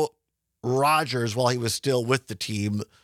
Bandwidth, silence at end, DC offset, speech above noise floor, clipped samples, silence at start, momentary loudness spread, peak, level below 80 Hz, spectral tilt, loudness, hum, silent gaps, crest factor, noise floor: 16 kHz; 0.2 s; under 0.1%; 53 dB; under 0.1%; 0 s; 9 LU; -8 dBFS; -68 dBFS; -4.5 dB/octave; -25 LUFS; none; none; 18 dB; -78 dBFS